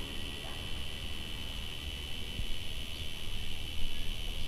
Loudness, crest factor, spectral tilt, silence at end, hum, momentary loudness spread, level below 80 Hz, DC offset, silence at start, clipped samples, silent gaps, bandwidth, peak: -40 LUFS; 16 dB; -3.5 dB/octave; 0 s; none; 1 LU; -40 dBFS; under 0.1%; 0 s; under 0.1%; none; 14 kHz; -18 dBFS